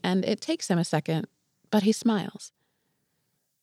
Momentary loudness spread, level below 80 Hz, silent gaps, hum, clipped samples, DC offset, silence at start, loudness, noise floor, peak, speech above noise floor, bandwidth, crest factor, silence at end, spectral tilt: 17 LU; -78 dBFS; none; none; under 0.1%; under 0.1%; 0.05 s; -27 LUFS; -76 dBFS; -12 dBFS; 49 dB; 13.5 kHz; 16 dB; 1.15 s; -5.5 dB/octave